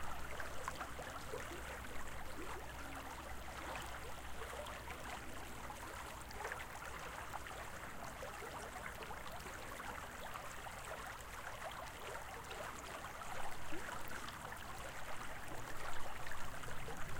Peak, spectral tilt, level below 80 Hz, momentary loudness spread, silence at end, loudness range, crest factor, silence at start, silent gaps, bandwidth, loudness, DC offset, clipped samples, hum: -26 dBFS; -3 dB/octave; -56 dBFS; 3 LU; 0 s; 1 LU; 18 dB; 0 s; none; 17 kHz; -48 LUFS; under 0.1%; under 0.1%; none